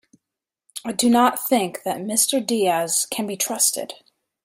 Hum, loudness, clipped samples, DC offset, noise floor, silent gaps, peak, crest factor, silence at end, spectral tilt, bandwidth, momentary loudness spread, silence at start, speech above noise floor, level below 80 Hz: none; -20 LUFS; under 0.1%; under 0.1%; -86 dBFS; none; -4 dBFS; 18 dB; 0.5 s; -2.5 dB/octave; 16 kHz; 12 LU; 0.75 s; 65 dB; -70 dBFS